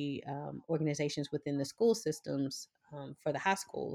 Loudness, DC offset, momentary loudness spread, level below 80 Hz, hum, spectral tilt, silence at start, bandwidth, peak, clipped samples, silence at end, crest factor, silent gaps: -36 LUFS; under 0.1%; 13 LU; -76 dBFS; none; -5 dB/octave; 0 s; 15.5 kHz; -18 dBFS; under 0.1%; 0 s; 18 dB; none